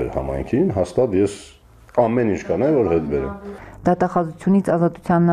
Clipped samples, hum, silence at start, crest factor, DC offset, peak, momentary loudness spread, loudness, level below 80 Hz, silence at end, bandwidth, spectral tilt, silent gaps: under 0.1%; none; 0 s; 16 dB; under 0.1%; -2 dBFS; 7 LU; -20 LUFS; -40 dBFS; 0 s; 10.5 kHz; -8.5 dB/octave; none